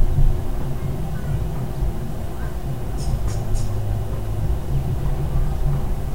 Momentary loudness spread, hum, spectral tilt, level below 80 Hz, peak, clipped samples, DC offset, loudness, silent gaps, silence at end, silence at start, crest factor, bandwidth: 5 LU; none; -7.5 dB/octave; -24 dBFS; -4 dBFS; under 0.1%; 4%; -26 LUFS; none; 0 s; 0 s; 16 dB; 16 kHz